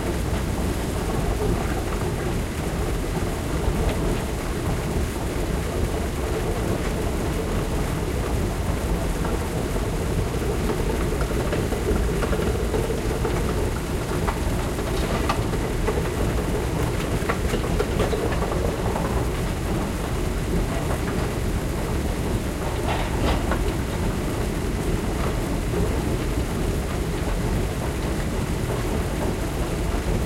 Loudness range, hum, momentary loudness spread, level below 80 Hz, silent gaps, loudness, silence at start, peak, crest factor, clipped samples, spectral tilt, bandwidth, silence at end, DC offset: 1 LU; none; 2 LU; -28 dBFS; none; -25 LUFS; 0 s; -6 dBFS; 16 dB; under 0.1%; -6 dB/octave; 16 kHz; 0 s; under 0.1%